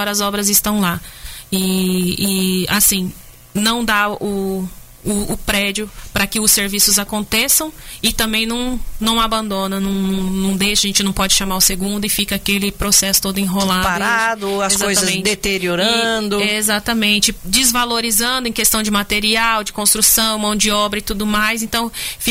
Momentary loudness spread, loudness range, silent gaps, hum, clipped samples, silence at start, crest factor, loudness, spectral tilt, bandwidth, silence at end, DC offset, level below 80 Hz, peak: 8 LU; 3 LU; none; none; under 0.1%; 0 s; 16 dB; -15 LUFS; -2.5 dB/octave; 16.5 kHz; 0 s; under 0.1%; -34 dBFS; 0 dBFS